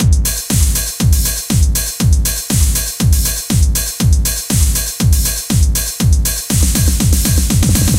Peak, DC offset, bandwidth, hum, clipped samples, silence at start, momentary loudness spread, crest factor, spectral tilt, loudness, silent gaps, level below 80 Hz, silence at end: 0 dBFS; under 0.1%; 17 kHz; none; under 0.1%; 0 s; 2 LU; 12 dB; -4 dB/octave; -14 LUFS; none; -16 dBFS; 0 s